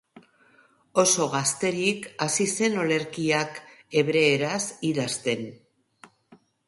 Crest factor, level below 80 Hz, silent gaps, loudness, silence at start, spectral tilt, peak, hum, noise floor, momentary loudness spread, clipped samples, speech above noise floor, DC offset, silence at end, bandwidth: 20 dB; -70 dBFS; none; -24 LUFS; 0.95 s; -3.5 dB/octave; -8 dBFS; none; -60 dBFS; 8 LU; under 0.1%; 35 dB; under 0.1%; 0.3 s; 11.5 kHz